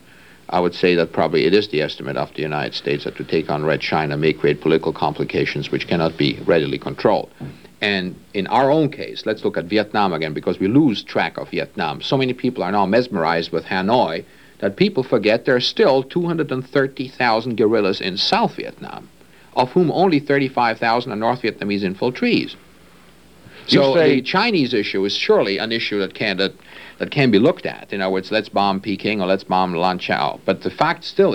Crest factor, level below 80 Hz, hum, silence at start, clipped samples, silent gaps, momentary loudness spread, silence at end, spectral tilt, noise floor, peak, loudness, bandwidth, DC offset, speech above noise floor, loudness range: 18 dB; -54 dBFS; none; 0.5 s; under 0.1%; none; 8 LU; 0 s; -6.5 dB/octave; -48 dBFS; -2 dBFS; -19 LUFS; 12.5 kHz; 0.2%; 29 dB; 2 LU